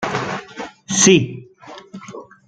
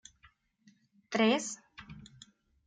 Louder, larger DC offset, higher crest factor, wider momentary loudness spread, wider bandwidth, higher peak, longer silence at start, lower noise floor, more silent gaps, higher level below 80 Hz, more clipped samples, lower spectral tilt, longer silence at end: first, -16 LUFS vs -31 LUFS; neither; about the same, 20 dB vs 22 dB; about the same, 25 LU vs 24 LU; first, 10.5 kHz vs 9.4 kHz; first, 0 dBFS vs -14 dBFS; second, 0 s vs 1.1 s; second, -40 dBFS vs -67 dBFS; neither; first, -56 dBFS vs -70 dBFS; neither; about the same, -3.5 dB/octave vs -3.5 dB/octave; second, 0.25 s vs 0.6 s